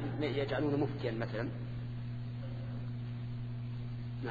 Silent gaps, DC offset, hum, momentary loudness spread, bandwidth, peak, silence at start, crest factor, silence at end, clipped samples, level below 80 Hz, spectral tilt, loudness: none; under 0.1%; none; 8 LU; 4.9 kHz; -20 dBFS; 0 s; 16 dB; 0 s; under 0.1%; -54 dBFS; -6.5 dB/octave; -38 LUFS